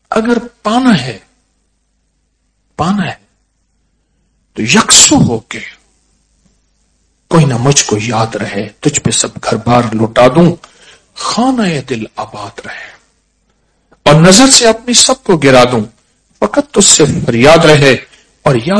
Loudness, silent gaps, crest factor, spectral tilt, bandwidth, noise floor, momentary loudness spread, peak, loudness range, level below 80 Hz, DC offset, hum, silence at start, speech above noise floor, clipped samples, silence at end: -8 LUFS; none; 10 dB; -3.5 dB/octave; 11 kHz; -60 dBFS; 19 LU; 0 dBFS; 10 LU; -38 dBFS; under 0.1%; none; 0.1 s; 51 dB; 3%; 0 s